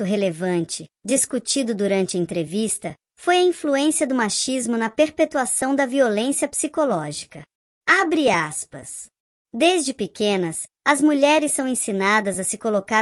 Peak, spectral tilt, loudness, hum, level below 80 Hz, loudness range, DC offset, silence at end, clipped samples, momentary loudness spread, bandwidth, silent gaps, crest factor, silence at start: -4 dBFS; -3.5 dB/octave; -21 LUFS; none; -64 dBFS; 2 LU; under 0.1%; 0 s; under 0.1%; 10 LU; 14 kHz; 7.55-7.81 s, 9.20-9.45 s; 18 dB; 0 s